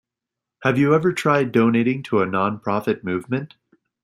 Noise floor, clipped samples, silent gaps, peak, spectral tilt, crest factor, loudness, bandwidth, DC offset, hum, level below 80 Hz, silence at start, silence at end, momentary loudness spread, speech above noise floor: -85 dBFS; under 0.1%; none; -2 dBFS; -7 dB/octave; 18 dB; -20 LUFS; 15 kHz; under 0.1%; none; -62 dBFS; 0.6 s; 0.55 s; 8 LU; 66 dB